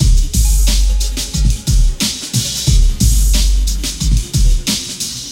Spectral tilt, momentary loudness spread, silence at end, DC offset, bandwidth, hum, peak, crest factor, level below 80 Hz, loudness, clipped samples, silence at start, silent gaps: -3.5 dB/octave; 5 LU; 0 s; under 0.1%; 16.5 kHz; none; 0 dBFS; 12 dB; -14 dBFS; -15 LUFS; under 0.1%; 0 s; none